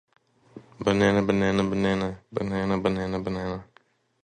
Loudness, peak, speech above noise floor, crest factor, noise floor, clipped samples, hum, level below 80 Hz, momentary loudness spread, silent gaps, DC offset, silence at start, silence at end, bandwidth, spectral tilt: -26 LUFS; -6 dBFS; 37 dB; 20 dB; -62 dBFS; under 0.1%; none; -50 dBFS; 10 LU; none; under 0.1%; 0.55 s; 0.6 s; 9.2 kHz; -6.5 dB/octave